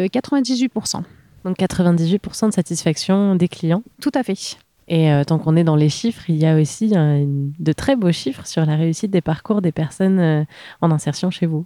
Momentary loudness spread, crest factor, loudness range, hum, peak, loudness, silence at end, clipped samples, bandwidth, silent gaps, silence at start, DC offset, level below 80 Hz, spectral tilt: 7 LU; 14 dB; 2 LU; none; -4 dBFS; -18 LUFS; 0 s; under 0.1%; 13 kHz; none; 0 s; under 0.1%; -50 dBFS; -6.5 dB/octave